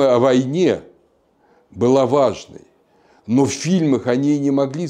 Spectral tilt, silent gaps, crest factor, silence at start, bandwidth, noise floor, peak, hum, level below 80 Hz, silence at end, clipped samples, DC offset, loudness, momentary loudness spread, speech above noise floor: -6.5 dB/octave; none; 14 dB; 0 s; 10.5 kHz; -58 dBFS; -4 dBFS; none; -58 dBFS; 0 s; under 0.1%; under 0.1%; -17 LUFS; 6 LU; 42 dB